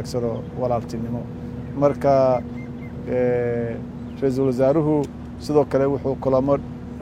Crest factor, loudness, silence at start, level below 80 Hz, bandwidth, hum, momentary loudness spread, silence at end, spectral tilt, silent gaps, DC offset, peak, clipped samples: 18 dB; -22 LUFS; 0 s; -42 dBFS; 14 kHz; none; 14 LU; 0 s; -8 dB/octave; none; under 0.1%; -4 dBFS; under 0.1%